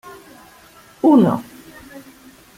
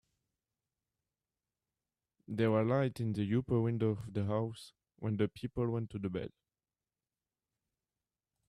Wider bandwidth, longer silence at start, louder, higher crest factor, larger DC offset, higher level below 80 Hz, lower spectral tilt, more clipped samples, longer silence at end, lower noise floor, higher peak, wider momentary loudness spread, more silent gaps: first, 16 kHz vs 12 kHz; second, 0.05 s vs 2.3 s; first, -16 LUFS vs -35 LUFS; about the same, 18 dB vs 18 dB; neither; first, -58 dBFS vs -66 dBFS; about the same, -8 dB/octave vs -8.5 dB/octave; neither; second, 0.55 s vs 2.2 s; second, -47 dBFS vs under -90 dBFS; first, -4 dBFS vs -20 dBFS; first, 27 LU vs 11 LU; neither